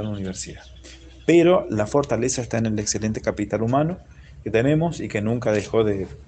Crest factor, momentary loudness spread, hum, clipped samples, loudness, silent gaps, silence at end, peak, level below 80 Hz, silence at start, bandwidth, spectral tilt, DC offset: 18 dB; 12 LU; none; under 0.1%; -22 LUFS; none; 0.05 s; -4 dBFS; -46 dBFS; 0 s; 9.2 kHz; -5.5 dB/octave; under 0.1%